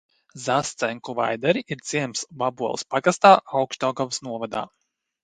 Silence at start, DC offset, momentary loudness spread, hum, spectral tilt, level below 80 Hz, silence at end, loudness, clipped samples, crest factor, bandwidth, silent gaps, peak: 0.35 s; under 0.1%; 14 LU; none; -4 dB/octave; -66 dBFS; 0.6 s; -23 LUFS; under 0.1%; 24 dB; 10.5 kHz; none; 0 dBFS